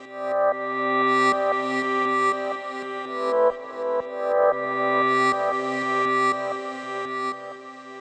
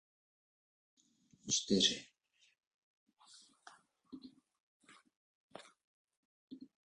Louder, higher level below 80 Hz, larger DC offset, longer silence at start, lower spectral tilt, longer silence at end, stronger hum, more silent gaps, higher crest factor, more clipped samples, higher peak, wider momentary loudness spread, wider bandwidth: first, -23 LUFS vs -33 LUFS; first, -72 dBFS vs -78 dBFS; neither; second, 0 s vs 1.45 s; first, -4 dB/octave vs -2.5 dB/octave; second, 0 s vs 0.3 s; neither; second, none vs 2.67-3.07 s, 4.60-4.80 s, 5.16-5.50 s, 5.84-6.05 s, 6.17-6.48 s; second, 16 dB vs 28 dB; neither; first, -8 dBFS vs -16 dBFS; second, 11 LU vs 27 LU; second, 8.8 kHz vs 10.5 kHz